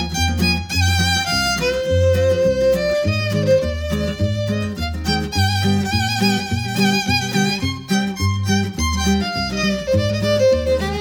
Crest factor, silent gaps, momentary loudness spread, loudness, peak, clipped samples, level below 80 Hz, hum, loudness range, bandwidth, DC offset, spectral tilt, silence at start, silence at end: 14 dB; none; 5 LU; -18 LUFS; -4 dBFS; under 0.1%; -32 dBFS; none; 2 LU; over 20 kHz; under 0.1%; -5 dB/octave; 0 s; 0 s